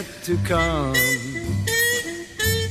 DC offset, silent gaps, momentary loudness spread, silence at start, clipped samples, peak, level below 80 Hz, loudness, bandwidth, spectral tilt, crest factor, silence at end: under 0.1%; none; 7 LU; 0 s; under 0.1%; -8 dBFS; -36 dBFS; -21 LUFS; 16 kHz; -3.5 dB/octave; 16 dB; 0 s